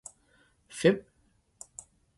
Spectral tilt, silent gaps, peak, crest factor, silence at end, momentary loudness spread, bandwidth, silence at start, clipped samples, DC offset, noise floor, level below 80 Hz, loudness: -5 dB/octave; none; -10 dBFS; 24 dB; 1.2 s; 23 LU; 11.5 kHz; 0.75 s; under 0.1%; under 0.1%; -69 dBFS; -68 dBFS; -28 LUFS